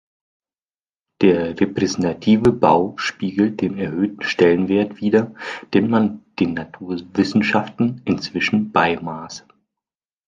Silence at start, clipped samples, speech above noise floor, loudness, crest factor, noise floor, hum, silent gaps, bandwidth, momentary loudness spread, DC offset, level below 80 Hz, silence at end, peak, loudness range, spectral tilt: 1.2 s; under 0.1%; over 71 dB; -19 LUFS; 18 dB; under -90 dBFS; none; none; 7.6 kHz; 12 LU; under 0.1%; -52 dBFS; 0.9 s; -2 dBFS; 3 LU; -6 dB/octave